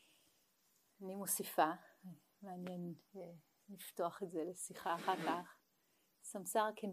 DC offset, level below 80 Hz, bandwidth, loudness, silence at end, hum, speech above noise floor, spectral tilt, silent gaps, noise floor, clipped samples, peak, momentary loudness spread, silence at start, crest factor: under 0.1%; under -90 dBFS; 15.5 kHz; -42 LUFS; 0 s; none; 36 dB; -3.5 dB/octave; none; -79 dBFS; under 0.1%; -20 dBFS; 19 LU; 1 s; 24 dB